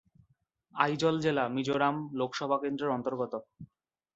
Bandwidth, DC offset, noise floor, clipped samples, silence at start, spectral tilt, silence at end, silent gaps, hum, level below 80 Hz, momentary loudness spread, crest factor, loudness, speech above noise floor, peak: 8.2 kHz; under 0.1%; -72 dBFS; under 0.1%; 0.75 s; -6 dB/octave; 0.5 s; none; none; -72 dBFS; 8 LU; 22 dB; -31 LUFS; 41 dB; -10 dBFS